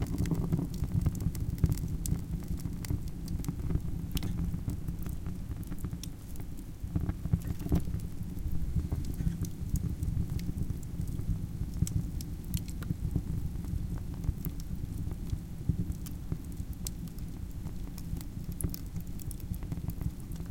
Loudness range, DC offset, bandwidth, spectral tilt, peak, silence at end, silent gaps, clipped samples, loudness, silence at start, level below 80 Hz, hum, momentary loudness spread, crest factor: 5 LU; under 0.1%; 17 kHz; -6.5 dB/octave; -12 dBFS; 0 s; none; under 0.1%; -37 LUFS; 0 s; -40 dBFS; none; 9 LU; 22 dB